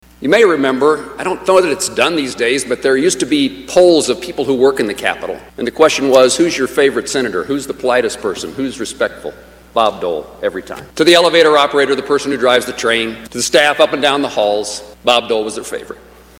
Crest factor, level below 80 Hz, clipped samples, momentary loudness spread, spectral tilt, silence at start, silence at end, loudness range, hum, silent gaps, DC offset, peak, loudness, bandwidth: 14 dB; -48 dBFS; 0.2%; 12 LU; -3 dB/octave; 0.2 s; 0.45 s; 5 LU; none; none; under 0.1%; 0 dBFS; -14 LUFS; 17 kHz